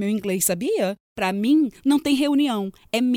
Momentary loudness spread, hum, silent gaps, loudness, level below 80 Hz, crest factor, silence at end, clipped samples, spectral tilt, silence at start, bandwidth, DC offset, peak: 7 LU; none; 1.00-1.16 s; -22 LUFS; -60 dBFS; 14 dB; 0 s; under 0.1%; -4 dB/octave; 0 s; 19 kHz; under 0.1%; -8 dBFS